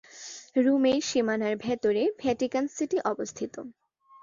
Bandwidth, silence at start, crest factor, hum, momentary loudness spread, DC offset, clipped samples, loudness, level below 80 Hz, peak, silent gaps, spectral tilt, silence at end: 7.6 kHz; 0.15 s; 16 dB; none; 15 LU; under 0.1%; under 0.1%; -27 LUFS; -66 dBFS; -12 dBFS; none; -4 dB/octave; 0.5 s